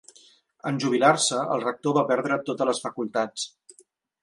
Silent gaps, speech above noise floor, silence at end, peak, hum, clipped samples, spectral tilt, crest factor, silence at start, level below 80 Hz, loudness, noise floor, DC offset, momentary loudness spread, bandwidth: none; 36 dB; 0.75 s; -4 dBFS; none; under 0.1%; -4 dB/octave; 22 dB; 0.65 s; -74 dBFS; -25 LUFS; -61 dBFS; under 0.1%; 11 LU; 11.5 kHz